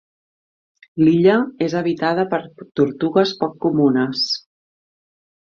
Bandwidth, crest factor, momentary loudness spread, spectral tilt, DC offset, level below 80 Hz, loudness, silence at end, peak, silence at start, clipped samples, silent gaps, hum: 7.4 kHz; 18 dB; 9 LU; -6.5 dB/octave; under 0.1%; -60 dBFS; -18 LUFS; 1.2 s; -2 dBFS; 0.95 s; under 0.1%; none; none